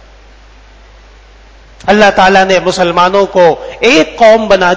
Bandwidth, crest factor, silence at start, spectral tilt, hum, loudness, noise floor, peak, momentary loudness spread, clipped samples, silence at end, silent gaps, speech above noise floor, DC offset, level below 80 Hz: 8 kHz; 10 dB; 1.85 s; -4 dB/octave; none; -7 LUFS; -37 dBFS; 0 dBFS; 5 LU; 2%; 0 s; none; 30 dB; under 0.1%; -36 dBFS